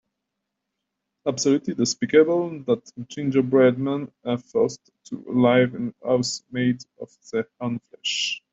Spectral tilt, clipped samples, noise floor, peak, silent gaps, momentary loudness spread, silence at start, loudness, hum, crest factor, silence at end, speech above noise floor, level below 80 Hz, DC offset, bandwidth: -5 dB/octave; under 0.1%; -81 dBFS; -4 dBFS; none; 12 LU; 1.25 s; -23 LUFS; none; 20 dB; 0.15 s; 59 dB; -66 dBFS; under 0.1%; 7.8 kHz